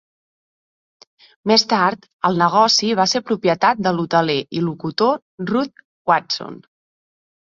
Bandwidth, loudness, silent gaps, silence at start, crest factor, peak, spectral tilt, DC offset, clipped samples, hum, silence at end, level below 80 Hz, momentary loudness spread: 7.8 kHz; -18 LUFS; 2.13-2.19 s, 5.22-5.38 s, 5.85-6.05 s; 1.45 s; 20 dB; 0 dBFS; -4 dB/octave; under 0.1%; under 0.1%; none; 1 s; -62 dBFS; 11 LU